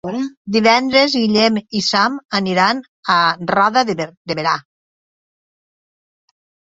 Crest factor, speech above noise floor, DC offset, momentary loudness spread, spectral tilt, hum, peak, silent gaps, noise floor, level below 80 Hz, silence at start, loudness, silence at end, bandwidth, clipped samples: 18 dB; over 74 dB; under 0.1%; 10 LU; -4 dB/octave; none; 0 dBFS; 0.37-0.45 s, 2.25-2.29 s, 2.88-3.03 s, 4.17-4.25 s; under -90 dBFS; -58 dBFS; 0.05 s; -16 LUFS; 2.1 s; 8 kHz; under 0.1%